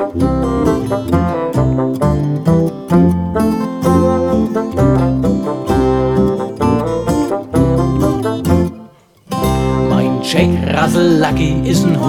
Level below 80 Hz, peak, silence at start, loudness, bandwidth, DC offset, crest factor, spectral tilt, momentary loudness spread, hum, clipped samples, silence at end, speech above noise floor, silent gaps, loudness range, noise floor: -28 dBFS; 0 dBFS; 0 s; -14 LUFS; 17.5 kHz; 0.4%; 12 dB; -7 dB/octave; 4 LU; none; under 0.1%; 0 s; 28 dB; none; 2 LU; -40 dBFS